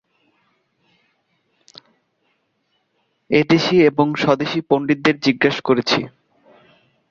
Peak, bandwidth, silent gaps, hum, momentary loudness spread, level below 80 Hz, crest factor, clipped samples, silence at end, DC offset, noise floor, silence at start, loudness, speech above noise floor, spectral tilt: -2 dBFS; 7.4 kHz; none; none; 5 LU; -60 dBFS; 18 dB; under 0.1%; 1 s; under 0.1%; -68 dBFS; 3.3 s; -17 LUFS; 52 dB; -6 dB/octave